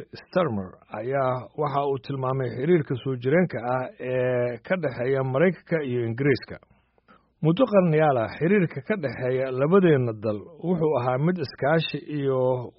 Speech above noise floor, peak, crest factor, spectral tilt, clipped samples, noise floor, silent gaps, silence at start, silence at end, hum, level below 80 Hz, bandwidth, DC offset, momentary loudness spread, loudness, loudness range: 35 dB; -6 dBFS; 18 dB; -6.5 dB/octave; under 0.1%; -59 dBFS; none; 0 s; 0.1 s; none; -62 dBFS; 5.8 kHz; under 0.1%; 9 LU; -24 LUFS; 3 LU